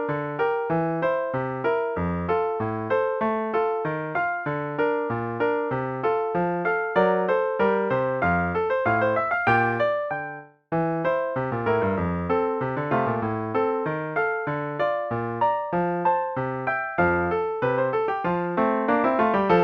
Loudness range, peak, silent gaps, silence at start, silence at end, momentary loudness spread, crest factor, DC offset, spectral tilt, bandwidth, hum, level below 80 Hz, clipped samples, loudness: 3 LU; -8 dBFS; none; 0 s; 0 s; 6 LU; 16 dB; under 0.1%; -9 dB/octave; 6 kHz; none; -54 dBFS; under 0.1%; -24 LUFS